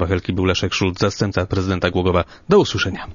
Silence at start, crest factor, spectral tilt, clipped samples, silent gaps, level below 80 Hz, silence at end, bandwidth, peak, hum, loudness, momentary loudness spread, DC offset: 0 s; 18 dB; -5.5 dB/octave; under 0.1%; none; -40 dBFS; 0 s; 7.4 kHz; 0 dBFS; none; -19 LUFS; 5 LU; under 0.1%